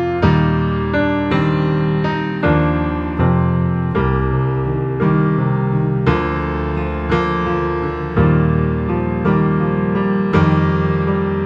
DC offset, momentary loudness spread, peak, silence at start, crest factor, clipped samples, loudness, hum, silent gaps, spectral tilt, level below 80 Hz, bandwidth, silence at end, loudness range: under 0.1%; 5 LU; -2 dBFS; 0 s; 14 dB; under 0.1%; -17 LUFS; none; none; -9.5 dB/octave; -30 dBFS; 6 kHz; 0 s; 1 LU